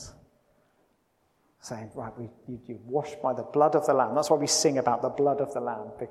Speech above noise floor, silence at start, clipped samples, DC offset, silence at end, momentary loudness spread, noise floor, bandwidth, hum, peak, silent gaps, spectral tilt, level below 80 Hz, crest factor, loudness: 43 dB; 0 s; under 0.1%; under 0.1%; 0 s; 18 LU; -70 dBFS; 14.5 kHz; none; -10 dBFS; none; -4 dB/octave; -66 dBFS; 20 dB; -26 LUFS